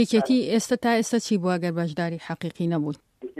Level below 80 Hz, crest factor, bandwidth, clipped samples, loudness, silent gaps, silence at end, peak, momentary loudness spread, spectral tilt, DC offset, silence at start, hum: -66 dBFS; 14 dB; 15 kHz; under 0.1%; -25 LUFS; none; 0 s; -10 dBFS; 10 LU; -5.5 dB/octave; under 0.1%; 0 s; none